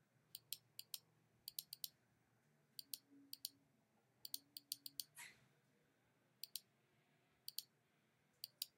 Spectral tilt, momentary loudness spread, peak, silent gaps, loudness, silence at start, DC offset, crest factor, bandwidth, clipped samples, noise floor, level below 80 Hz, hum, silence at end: 1 dB/octave; 8 LU; -24 dBFS; none; -54 LUFS; 0.35 s; under 0.1%; 34 dB; 17 kHz; under 0.1%; -81 dBFS; under -90 dBFS; none; 0.1 s